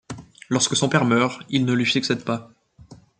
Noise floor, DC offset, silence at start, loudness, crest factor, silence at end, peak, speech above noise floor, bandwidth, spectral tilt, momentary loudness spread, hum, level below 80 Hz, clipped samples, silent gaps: -48 dBFS; under 0.1%; 0.1 s; -21 LUFS; 20 dB; 0.25 s; -4 dBFS; 27 dB; 9.4 kHz; -4 dB/octave; 11 LU; none; -60 dBFS; under 0.1%; none